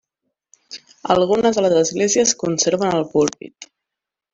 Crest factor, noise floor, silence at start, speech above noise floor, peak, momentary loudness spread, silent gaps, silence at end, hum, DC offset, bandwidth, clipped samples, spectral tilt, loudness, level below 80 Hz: 18 dB; -85 dBFS; 0.7 s; 68 dB; -2 dBFS; 21 LU; none; 0.7 s; none; under 0.1%; 8 kHz; under 0.1%; -3.5 dB/octave; -17 LUFS; -58 dBFS